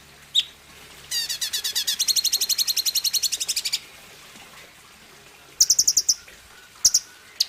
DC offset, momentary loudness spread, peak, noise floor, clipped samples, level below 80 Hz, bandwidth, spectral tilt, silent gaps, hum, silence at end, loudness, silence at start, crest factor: under 0.1%; 10 LU; -4 dBFS; -48 dBFS; under 0.1%; -60 dBFS; 16 kHz; 3 dB/octave; none; none; 0 s; -20 LUFS; 0.35 s; 20 dB